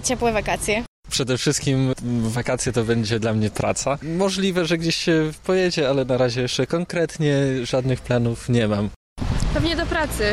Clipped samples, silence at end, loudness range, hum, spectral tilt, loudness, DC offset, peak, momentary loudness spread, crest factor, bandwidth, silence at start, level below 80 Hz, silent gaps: under 0.1%; 0 s; 1 LU; none; -5 dB/octave; -22 LUFS; under 0.1%; -8 dBFS; 4 LU; 14 dB; 15 kHz; 0 s; -36 dBFS; 0.88-1.03 s, 8.96-9.16 s